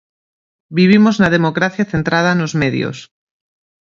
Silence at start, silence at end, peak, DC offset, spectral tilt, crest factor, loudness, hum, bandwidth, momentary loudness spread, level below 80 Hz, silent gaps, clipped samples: 0.7 s; 0.75 s; 0 dBFS; under 0.1%; -6.5 dB/octave; 16 dB; -14 LUFS; none; 7.4 kHz; 12 LU; -48 dBFS; none; under 0.1%